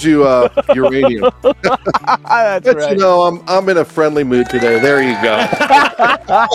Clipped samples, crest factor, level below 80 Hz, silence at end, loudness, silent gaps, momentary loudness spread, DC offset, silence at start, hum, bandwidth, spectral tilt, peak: under 0.1%; 12 dB; -44 dBFS; 0 s; -12 LUFS; none; 5 LU; under 0.1%; 0 s; none; 14 kHz; -5 dB/octave; 0 dBFS